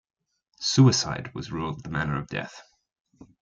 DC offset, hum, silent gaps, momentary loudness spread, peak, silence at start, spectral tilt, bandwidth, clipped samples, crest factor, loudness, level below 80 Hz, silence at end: under 0.1%; none; 3.01-3.05 s; 15 LU; -6 dBFS; 0.6 s; -5 dB/octave; 7.6 kHz; under 0.1%; 20 dB; -25 LUFS; -54 dBFS; 0.2 s